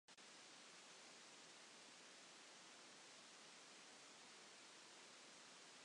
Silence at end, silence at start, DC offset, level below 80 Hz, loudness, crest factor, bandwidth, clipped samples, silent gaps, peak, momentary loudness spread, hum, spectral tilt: 0 s; 0.1 s; under 0.1%; under -90 dBFS; -61 LUFS; 14 dB; 11 kHz; under 0.1%; none; -50 dBFS; 0 LU; none; -0.5 dB/octave